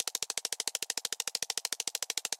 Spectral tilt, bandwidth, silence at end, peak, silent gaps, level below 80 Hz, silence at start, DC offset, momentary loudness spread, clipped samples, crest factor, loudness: 2.5 dB/octave; 17 kHz; 0.05 s; -12 dBFS; none; -86 dBFS; 0 s; under 0.1%; 1 LU; under 0.1%; 24 dB; -33 LUFS